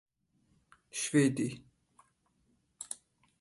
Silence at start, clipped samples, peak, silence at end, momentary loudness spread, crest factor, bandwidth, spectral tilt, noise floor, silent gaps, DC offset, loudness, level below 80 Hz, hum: 0.95 s; under 0.1%; -16 dBFS; 0.45 s; 19 LU; 22 dB; 11.5 kHz; -5 dB/octave; -74 dBFS; none; under 0.1%; -33 LUFS; -74 dBFS; none